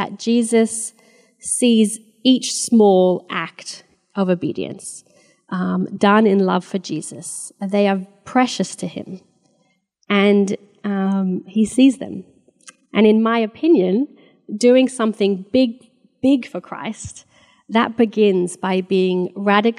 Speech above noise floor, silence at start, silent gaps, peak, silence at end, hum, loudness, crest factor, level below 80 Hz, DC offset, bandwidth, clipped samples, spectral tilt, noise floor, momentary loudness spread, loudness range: 47 dB; 0 s; none; 0 dBFS; 0.05 s; none; -18 LUFS; 18 dB; -62 dBFS; under 0.1%; 12.5 kHz; under 0.1%; -5 dB/octave; -64 dBFS; 15 LU; 4 LU